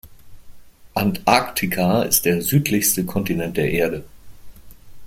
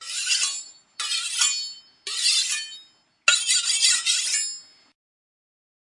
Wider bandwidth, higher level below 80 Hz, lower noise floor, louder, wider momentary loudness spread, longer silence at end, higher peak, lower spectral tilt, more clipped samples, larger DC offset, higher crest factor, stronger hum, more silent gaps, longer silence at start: first, 16.5 kHz vs 12 kHz; first, -46 dBFS vs -88 dBFS; second, -40 dBFS vs -53 dBFS; about the same, -19 LUFS vs -21 LUFS; second, 6 LU vs 16 LU; second, 0 s vs 1.35 s; about the same, -2 dBFS vs 0 dBFS; first, -4.5 dB/octave vs 6 dB/octave; neither; neither; second, 20 dB vs 26 dB; neither; neither; about the same, 0.05 s vs 0 s